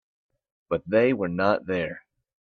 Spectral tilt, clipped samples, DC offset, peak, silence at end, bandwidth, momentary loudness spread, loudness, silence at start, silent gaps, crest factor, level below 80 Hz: -8.5 dB/octave; under 0.1%; under 0.1%; -8 dBFS; 0.4 s; 6.6 kHz; 10 LU; -25 LUFS; 0.7 s; none; 20 dB; -62 dBFS